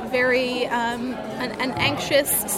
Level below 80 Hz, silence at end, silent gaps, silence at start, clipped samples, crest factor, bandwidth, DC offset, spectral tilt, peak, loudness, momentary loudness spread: -52 dBFS; 0 s; none; 0 s; under 0.1%; 16 dB; 16.5 kHz; under 0.1%; -3 dB/octave; -6 dBFS; -22 LUFS; 9 LU